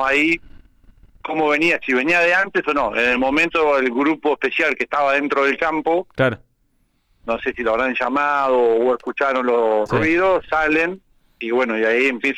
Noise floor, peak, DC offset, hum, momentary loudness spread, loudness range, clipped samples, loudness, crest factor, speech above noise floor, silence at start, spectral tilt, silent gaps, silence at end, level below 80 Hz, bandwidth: -63 dBFS; -6 dBFS; under 0.1%; none; 7 LU; 3 LU; under 0.1%; -18 LUFS; 12 dB; 45 dB; 0 s; -5.5 dB/octave; none; 0 s; -48 dBFS; 12.5 kHz